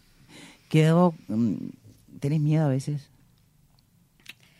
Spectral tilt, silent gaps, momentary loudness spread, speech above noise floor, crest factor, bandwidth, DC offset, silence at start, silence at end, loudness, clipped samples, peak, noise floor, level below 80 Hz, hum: -8 dB/octave; none; 14 LU; 38 dB; 20 dB; 12 kHz; under 0.1%; 0.35 s; 1.6 s; -25 LUFS; under 0.1%; -8 dBFS; -62 dBFS; -64 dBFS; none